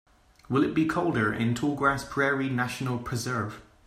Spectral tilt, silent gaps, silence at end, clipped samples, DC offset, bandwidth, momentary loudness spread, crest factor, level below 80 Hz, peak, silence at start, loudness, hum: -6 dB/octave; none; 0.25 s; under 0.1%; under 0.1%; 15.5 kHz; 6 LU; 18 dB; -54 dBFS; -10 dBFS; 0.5 s; -27 LUFS; none